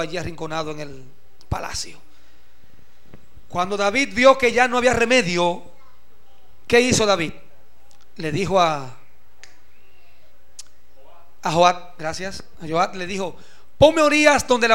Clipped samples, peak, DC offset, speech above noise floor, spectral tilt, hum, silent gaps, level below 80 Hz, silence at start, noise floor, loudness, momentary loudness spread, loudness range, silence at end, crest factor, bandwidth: under 0.1%; 0 dBFS; 2%; 37 dB; -3.5 dB/octave; none; none; -46 dBFS; 0 s; -57 dBFS; -19 LUFS; 16 LU; 8 LU; 0 s; 22 dB; 16 kHz